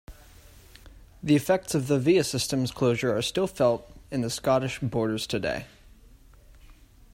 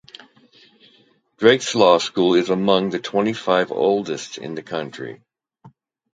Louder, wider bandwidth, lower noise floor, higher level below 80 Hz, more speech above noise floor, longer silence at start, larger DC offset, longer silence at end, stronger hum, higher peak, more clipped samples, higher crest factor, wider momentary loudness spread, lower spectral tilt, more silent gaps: second, -26 LUFS vs -19 LUFS; first, 16 kHz vs 9.4 kHz; second, -53 dBFS vs -58 dBFS; first, -52 dBFS vs -64 dBFS; second, 27 dB vs 39 dB; second, 0.1 s vs 1.4 s; neither; first, 1.45 s vs 0.45 s; neither; second, -10 dBFS vs 0 dBFS; neither; about the same, 18 dB vs 20 dB; second, 9 LU vs 15 LU; about the same, -5 dB/octave vs -4.5 dB/octave; neither